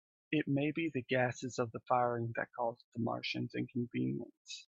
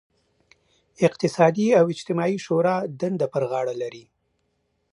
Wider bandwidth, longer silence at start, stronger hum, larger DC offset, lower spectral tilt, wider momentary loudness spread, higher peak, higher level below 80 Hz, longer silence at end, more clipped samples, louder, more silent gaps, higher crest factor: second, 8 kHz vs 11 kHz; second, 0.3 s vs 1 s; neither; neither; about the same, -6 dB/octave vs -6.5 dB/octave; second, 6 LU vs 9 LU; second, -18 dBFS vs -4 dBFS; second, -76 dBFS vs -70 dBFS; second, 0.05 s vs 0.95 s; neither; second, -37 LUFS vs -22 LUFS; first, 2.84-2.92 s, 4.37-4.45 s vs none; about the same, 18 dB vs 20 dB